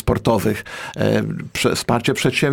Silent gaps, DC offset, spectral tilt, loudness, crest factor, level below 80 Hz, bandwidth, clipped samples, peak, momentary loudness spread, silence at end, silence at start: none; under 0.1%; -5 dB/octave; -19 LUFS; 16 dB; -38 dBFS; 18 kHz; under 0.1%; -4 dBFS; 7 LU; 0 s; 0.05 s